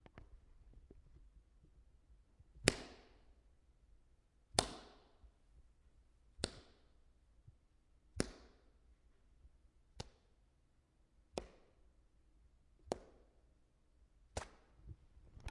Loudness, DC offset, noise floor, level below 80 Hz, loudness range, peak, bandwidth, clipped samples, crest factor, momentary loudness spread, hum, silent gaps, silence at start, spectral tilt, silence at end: -43 LUFS; under 0.1%; -74 dBFS; -62 dBFS; 15 LU; -8 dBFS; 11 kHz; under 0.1%; 42 dB; 27 LU; none; none; 0.15 s; -3 dB/octave; 0 s